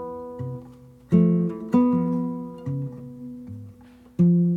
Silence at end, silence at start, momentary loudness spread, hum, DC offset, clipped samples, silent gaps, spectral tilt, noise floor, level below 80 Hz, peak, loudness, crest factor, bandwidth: 0 s; 0 s; 19 LU; none; under 0.1%; under 0.1%; none; -11.5 dB/octave; -48 dBFS; -60 dBFS; -8 dBFS; -24 LUFS; 16 dB; 3 kHz